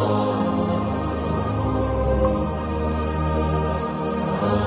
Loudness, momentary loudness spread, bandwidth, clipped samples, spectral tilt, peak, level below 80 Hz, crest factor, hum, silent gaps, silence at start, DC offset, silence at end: -23 LUFS; 4 LU; 4 kHz; under 0.1%; -12 dB/octave; -10 dBFS; -30 dBFS; 12 dB; none; none; 0 s; under 0.1%; 0 s